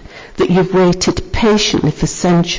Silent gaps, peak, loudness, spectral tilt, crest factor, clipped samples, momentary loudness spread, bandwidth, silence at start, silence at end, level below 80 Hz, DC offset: none; -4 dBFS; -13 LUFS; -5 dB/octave; 10 dB; under 0.1%; 5 LU; 7.6 kHz; 0 s; 0 s; -30 dBFS; under 0.1%